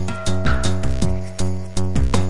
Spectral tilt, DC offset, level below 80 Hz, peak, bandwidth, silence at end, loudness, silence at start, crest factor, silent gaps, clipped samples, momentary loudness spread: -5.5 dB/octave; 8%; -26 dBFS; -4 dBFS; 11.5 kHz; 0 s; -23 LUFS; 0 s; 16 dB; none; under 0.1%; 5 LU